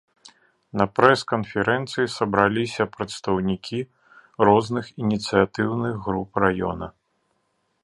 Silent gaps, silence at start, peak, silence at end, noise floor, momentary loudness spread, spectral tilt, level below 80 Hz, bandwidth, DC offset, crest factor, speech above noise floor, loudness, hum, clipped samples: none; 0.25 s; 0 dBFS; 0.95 s; -71 dBFS; 11 LU; -6 dB/octave; -52 dBFS; 11.5 kHz; under 0.1%; 24 dB; 49 dB; -23 LUFS; none; under 0.1%